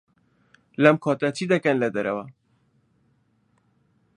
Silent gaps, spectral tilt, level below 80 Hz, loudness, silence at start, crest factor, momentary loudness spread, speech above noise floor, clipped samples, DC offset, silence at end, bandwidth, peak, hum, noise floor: none; -6.5 dB/octave; -70 dBFS; -22 LUFS; 0.8 s; 24 dB; 15 LU; 44 dB; under 0.1%; under 0.1%; 1.85 s; 11 kHz; -2 dBFS; none; -66 dBFS